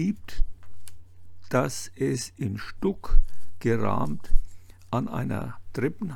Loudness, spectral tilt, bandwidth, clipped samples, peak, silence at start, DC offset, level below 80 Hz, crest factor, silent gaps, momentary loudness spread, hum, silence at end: -30 LUFS; -6 dB/octave; 12 kHz; under 0.1%; -4 dBFS; 0 s; under 0.1%; -30 dBFS; 20 dB; none; 12 LU; none; 0 s